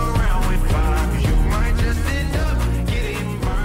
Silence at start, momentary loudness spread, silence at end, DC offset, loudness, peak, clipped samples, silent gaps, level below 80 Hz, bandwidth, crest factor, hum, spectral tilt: 0 s; 3 LU; 0 s; under 0.1%; -21 LUFS; -10 dBFS; under 0.1%; none; -20 dBFS; 16 kHz; 8 dB; none; -6 dB/octave